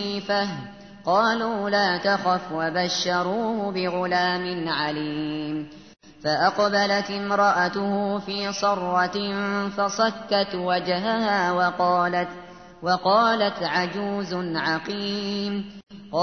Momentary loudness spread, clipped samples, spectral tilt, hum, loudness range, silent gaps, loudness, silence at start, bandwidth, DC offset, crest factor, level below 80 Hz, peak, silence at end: 9 LU; under 0.1%; -4.5 dB/octave; none; 2 LU; none; -24 LUFS; 0 s; 6.6 kHz; 0.1%; 16 dB; -62 dBFS; -8 dBFS; 0 s